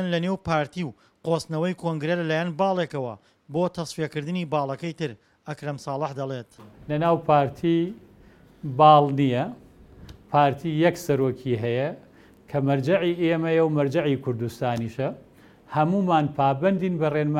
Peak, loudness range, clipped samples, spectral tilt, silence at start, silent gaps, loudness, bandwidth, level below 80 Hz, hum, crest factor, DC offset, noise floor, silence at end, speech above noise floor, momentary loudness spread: -4 dBFS; 7 LU; under 0.1%; -7 dB/octave; 0 s; none; -24 LUFS; 16 kHz; -58 dBFS; none; 20 dB; under 0.1%; -52 dBFS; 0 s; 29 dB; 12 LU